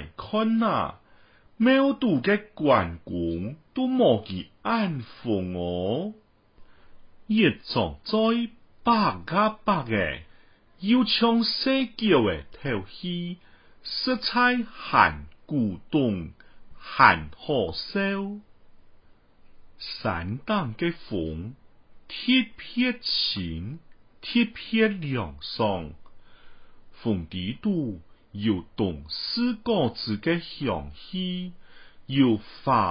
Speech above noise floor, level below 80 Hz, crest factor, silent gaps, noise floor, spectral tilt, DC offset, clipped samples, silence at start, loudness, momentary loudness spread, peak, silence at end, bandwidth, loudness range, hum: 30 dB; -50 dBFS; 24 dB; none; -55 dBFS; -10 dB/octave; under 0.1%; under 0.1%; 0 s; -25 LUFS; 13 LU; -2 dBFS; 0 s; 5.4 kHz; 7 LU; none